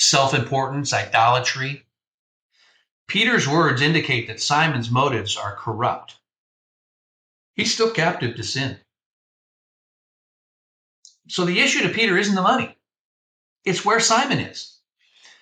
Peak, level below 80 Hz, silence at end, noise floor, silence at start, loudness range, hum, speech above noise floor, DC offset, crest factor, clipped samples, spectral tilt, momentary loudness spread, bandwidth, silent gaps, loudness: -4 dBFS; -62 dBFS; 0.7 s; -59 dBFS; 0 s; 6 LU; none; 39 dB; under 0.1%; 18 dB; under 0.1%; -3.5 dB/octave; 12 LU; 16 kHz; 2.07-2.50 s, 2.91-3.07 s, 6.38-7.54 s, 9.06-11.03 s, 13.00-13.56 s; -20 LUFS